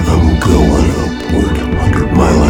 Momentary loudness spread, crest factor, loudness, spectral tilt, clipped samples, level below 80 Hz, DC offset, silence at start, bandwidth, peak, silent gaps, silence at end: 5 LU; 10 dB; -12 LUFS; -6.5 dB/octave; under 0.1%; -18 dBFS; under 0.1%; 0 s; 16 kHz; 0 dBFS; none; 0 s